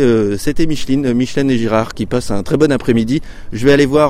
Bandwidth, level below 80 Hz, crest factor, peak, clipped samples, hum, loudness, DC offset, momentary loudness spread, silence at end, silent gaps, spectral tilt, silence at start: 15 kHz; -30 dBFS; 14 dB; 0 dBFS; under 0.1%; none; -15 LUFS; under 0.1%; 6 LU; 0 s; none; -6.5 dB/octave; 0 s